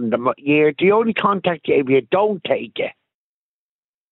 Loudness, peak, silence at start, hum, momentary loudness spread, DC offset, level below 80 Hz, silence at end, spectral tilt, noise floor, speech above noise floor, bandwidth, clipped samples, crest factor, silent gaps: -18 LUFS; -4 dBFS; 0 s; none; 8 LU; under 0.1%; -66 dBFS; 1.2 s; -9 dB/octave; under -90 dBFS; over 72 dB; 4.1 kHz; under 0.1%; 16 dB; none